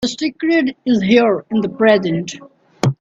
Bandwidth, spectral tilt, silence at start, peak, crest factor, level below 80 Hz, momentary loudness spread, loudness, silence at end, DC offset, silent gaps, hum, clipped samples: 8 kHz; -6 dB/octave; 0 s; 0 dBFS; 16 dB; -54 dBFS; 9 LU; -16 LUFS; 0.05 s; under 0.1%; none; none; under 0.1%